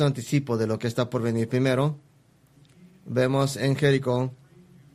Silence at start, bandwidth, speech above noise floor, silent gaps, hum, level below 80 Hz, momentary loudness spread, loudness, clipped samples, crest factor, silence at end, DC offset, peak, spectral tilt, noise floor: 0 s; 13.5 kHz; 35 dB; none; none; -60 dBFS; 6 LU; -25 LUFS; under 0.1%; 18 dB; 0.6 s; under 0.1%; -6 dBFS; -6.5 dB/octave; -59 dBFS